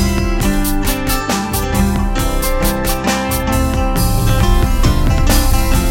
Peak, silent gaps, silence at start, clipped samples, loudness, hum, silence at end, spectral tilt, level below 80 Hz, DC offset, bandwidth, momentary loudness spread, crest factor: 0 dBFS; none; 0 s; under 0.1%; -16 LUFS; none; 0 s; -5 dB/octave; -16 dBFS; under 0.1%; 17 kHz; 3 LU; 14 dB